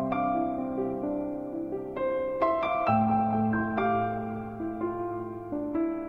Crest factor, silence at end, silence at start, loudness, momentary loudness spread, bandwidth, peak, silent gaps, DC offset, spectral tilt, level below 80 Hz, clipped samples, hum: 16 dB; 0 s; 0 s; -29 LUFS; 9 LU; 5.4 kHz; -12 dBFS; none; under 0.1%; -9.5 dB/octave; -56 dBFS; under 0.1%; none